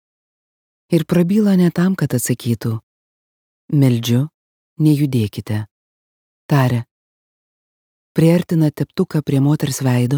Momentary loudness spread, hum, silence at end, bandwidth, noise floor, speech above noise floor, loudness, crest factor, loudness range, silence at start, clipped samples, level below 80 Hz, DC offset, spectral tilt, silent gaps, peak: 10 LU; none; 0 s; 20 kHz; under -90 dBFS; over 75 dB; -17 LUFS; 16 dB; 3 LU; 0.9 s; under 0.1%; -56 dBFS; under 0.1%; -7 dB/octave; 2.83-3.68 s, 4.34-4.76 s, 5.71-6.49 s, 6.91-8.15 s; -2 dBFS